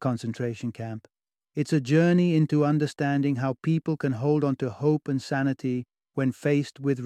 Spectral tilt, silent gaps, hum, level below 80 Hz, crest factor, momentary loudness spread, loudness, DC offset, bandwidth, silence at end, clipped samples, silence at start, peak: -7.5 dB/octave; none; none; -68 dBFS; 16 dB; 12 LU; -26 LUFS; under 0.1%; 10.5 kHz; 0 s; under 0.1%; 0 s; -10 dBFS